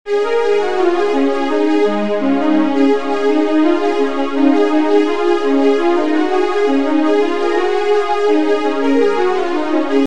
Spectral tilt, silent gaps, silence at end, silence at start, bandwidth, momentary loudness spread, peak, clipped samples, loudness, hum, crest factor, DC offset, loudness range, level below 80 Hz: -5 dB/octave; none; 0 s; 0.05 s; 9.6 kHz; 3 LU; 0 dBFS; under 0.1%; -15 LUFS; none; 12 dB; 7%; 1 LU; -54 dBFS